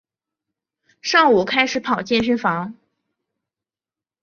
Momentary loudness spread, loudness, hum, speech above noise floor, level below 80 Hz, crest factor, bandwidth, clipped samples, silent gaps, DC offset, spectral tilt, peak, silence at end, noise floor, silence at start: 13 LU; -18 LUFS; none; over 72 dB; -56 dBFS; 20 dB; 7.2 kHz; under 0.1%; none; under 0.1%; -4 dB/octave; -2 dBFS; 1.5 s; under -90 dBFS; 1.05 s